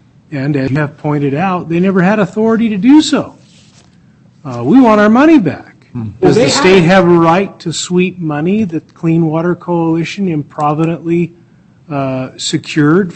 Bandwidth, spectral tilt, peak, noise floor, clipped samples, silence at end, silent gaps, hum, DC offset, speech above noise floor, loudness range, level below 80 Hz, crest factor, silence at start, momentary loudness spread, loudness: 8.6 kHz; -6 dB/octave; 0 dBFS; -44 dBFS; under 0.1%; 0.05 s; none; none; under 0.1%; 34 dB; 6 LU; -46 dBFS; 12 dB; 0.3 s; 12 LU; -11 LUFS